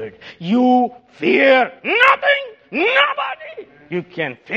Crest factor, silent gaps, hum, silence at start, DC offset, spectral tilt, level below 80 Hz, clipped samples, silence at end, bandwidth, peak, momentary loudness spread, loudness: 18 dB; none; none; 0 s; under 0.1%; -5.5 dB/octave; -66 dBFS; under 0.1%; 0 s; 7.8 kHz; 0 dBFS; 15 LU; -16 LUFS